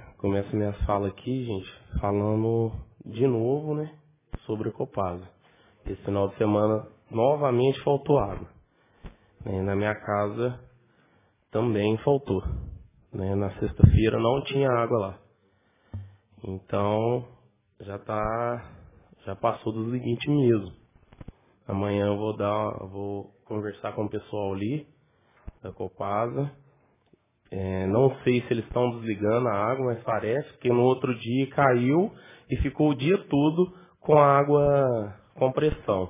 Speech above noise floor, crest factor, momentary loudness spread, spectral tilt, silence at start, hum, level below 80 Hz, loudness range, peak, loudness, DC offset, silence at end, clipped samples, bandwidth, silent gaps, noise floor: 41 dB; 26 dB; 16 LU; -11.5 dB/octave; 0 s; none; -42 dBFS; 8 LU; 0 dBFS; -26 LUFS; under 0.1%; 0 s; under 0.1%; 3.8 kHz; none; -66 dBFS